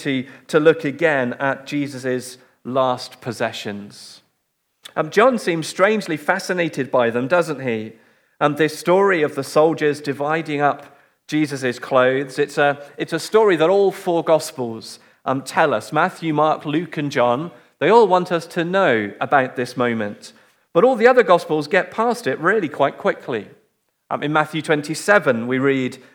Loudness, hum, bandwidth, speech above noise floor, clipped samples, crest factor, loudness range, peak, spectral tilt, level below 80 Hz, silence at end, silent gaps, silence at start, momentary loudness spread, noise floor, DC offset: -19 LUFS; none; 18 kHz; 52 dB; under 0.1%; 18 dB; 4 LU; 0 dBFS; -5.5 dB/octave; -76 dBFS; 0.2 s; none; 0 s; 12 LU; -71 dBFS; under 0.1%